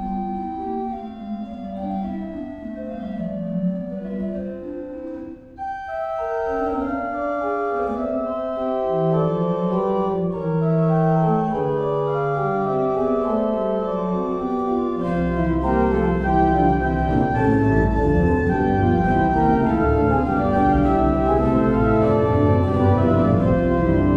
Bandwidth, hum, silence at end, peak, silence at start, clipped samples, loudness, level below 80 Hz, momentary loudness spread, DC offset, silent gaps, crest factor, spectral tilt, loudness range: 7 kHz; none; 0 s; -6 dBFS; 0 s; under 0.1%; -21 LUFS; -32 dBFS; 12 LU; under 0.1%; none; 14 dB; -10 dB/octave; 10 LU